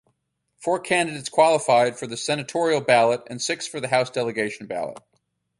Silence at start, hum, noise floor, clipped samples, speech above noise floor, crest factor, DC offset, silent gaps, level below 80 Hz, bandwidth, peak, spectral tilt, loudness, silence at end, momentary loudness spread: 0.6 s; none; -73 dBFS; under 0.1%; 50 dB; 20 dB; under 0.1%; none; -68 dBFS; 11.5 kHz; -4 dBFS; -3.5 dB/octave; -22 LUFS; 0.6 s; 11 LU